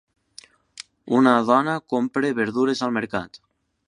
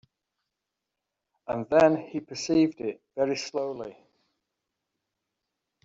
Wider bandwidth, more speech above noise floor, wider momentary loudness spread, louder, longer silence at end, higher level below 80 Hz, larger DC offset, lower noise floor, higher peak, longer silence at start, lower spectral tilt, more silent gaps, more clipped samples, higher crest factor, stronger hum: first, 11 kHz vs 7.8 kHz; second, 29 dB vs 59 dB; first, 23 LU vs 16 LU; first, -21 LUFS vs -27 LUFS; second, 0.6 s vs 1.9 s; about the same, -64 dBFS vs -68 dBFS; neither; second, -50 dBFS vs -86 dBFS; first, -2 dBFS vs -8 dBFS; second, 1.05 s vs 1.5 s; about the same, -5.5 dB/octave vs -5 dB/octave; neither; neither; about the same, 22 dB vs 22 dB; neither